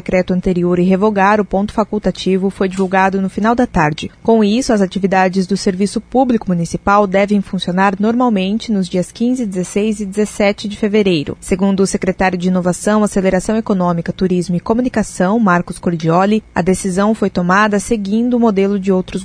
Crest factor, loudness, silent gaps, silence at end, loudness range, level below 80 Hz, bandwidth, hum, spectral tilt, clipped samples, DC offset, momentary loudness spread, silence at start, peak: 14 dB; -15 LUFS; none; 0 s; 2 LU; -38 dBFS; 11 kHz; none; -6 dB/octave; under 0.1%; under 0.1%; 5 LU; 0.05 s; 0 dBFS